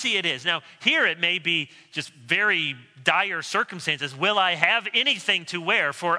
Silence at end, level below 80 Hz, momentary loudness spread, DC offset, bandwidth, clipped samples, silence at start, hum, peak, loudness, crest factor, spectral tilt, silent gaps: 0 s; -78 dBFS; 6 LU; under 0.1%; 11 kHz; under 0.1%; 0 s; none; -2 dBFS; -22 LUFS; 22 dB; -2.5 dB/octave; none